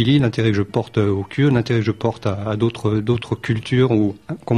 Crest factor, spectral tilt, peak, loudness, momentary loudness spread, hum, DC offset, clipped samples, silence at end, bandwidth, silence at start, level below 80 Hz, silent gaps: 14 dB; -7.5 dB/octave; -4 dBFS; -19 LUFS; 6 LU; none; 0.1%; under 0.1%; 0 s; 10.5 kHz; 0 s; -48 dBFS; none